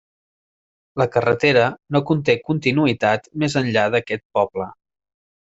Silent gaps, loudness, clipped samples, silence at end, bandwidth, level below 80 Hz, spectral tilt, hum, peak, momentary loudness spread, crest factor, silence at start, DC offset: 4.25-4.30 s; -19 LUFS; under 0.1%; 0.75 s; 8 kHz; -56 dBFS; -6 dB/octave; none; -2 dBFS; 8 LU; 18 dB; 0.95 s; under 0.1%